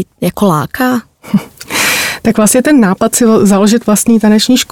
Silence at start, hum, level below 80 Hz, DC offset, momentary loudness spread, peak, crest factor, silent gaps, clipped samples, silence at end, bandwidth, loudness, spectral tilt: 0 s; none; -44 dBFS; under 0.1%; 8 LU; 0 dBFS; 10 dB; none; under 0.1%; 0.1 s; 17.5 kHz; -10 LUFS; -4 dB/octave